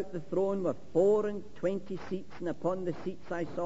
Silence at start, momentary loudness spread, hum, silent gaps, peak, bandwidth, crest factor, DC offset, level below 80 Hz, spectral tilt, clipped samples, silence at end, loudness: 0 s; 12 LU; none; none; -14 dBFS; 7.8 kHz; 18 dB; 0.9%; -64 dBFS; -8 dB/octave; under 0.1%; 0 s; -33 LUFS